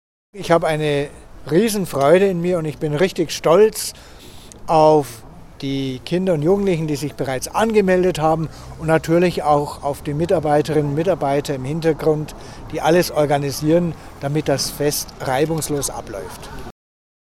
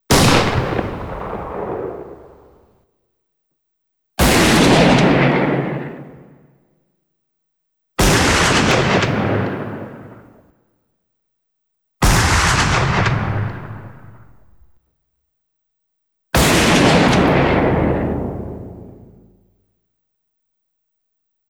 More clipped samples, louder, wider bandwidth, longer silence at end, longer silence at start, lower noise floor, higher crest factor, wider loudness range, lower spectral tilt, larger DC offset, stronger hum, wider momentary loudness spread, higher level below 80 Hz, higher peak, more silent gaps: neither; second, -18 LUFS vs -15 LUFS; second, 16.5 kHz vs over 20 kHz; second, 0.65 s vs 2.55 s; first, 0.35 s vs 0.1 s; second, -39 dBFS vs -73 dBFS; about the same, 18 dB vs 16 dB; second, 2 LU vs 11 LU; about the same, -5.5 dB/octave vs -4.5 dB/octave; neither; neither; second, 15 LU vs 20 LU; second, -42 dBFS vs -30 dBFS; about the same, 0 dBFS vs -2 dBFS; neither